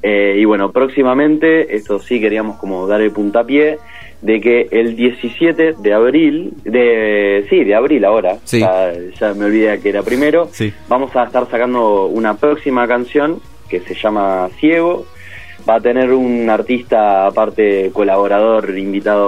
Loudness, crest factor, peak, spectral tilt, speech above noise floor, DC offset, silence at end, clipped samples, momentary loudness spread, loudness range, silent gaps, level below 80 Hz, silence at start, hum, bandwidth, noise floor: -13 LUFS; 12 dB; 0 dBFS; -6.5 dB/octave; 22 dB; 1%; 0 s; under 0.1%; 8 LU; 3 LU; none; -48 dBFS; 0.05 s; none; 13 kHz; -35 dBFS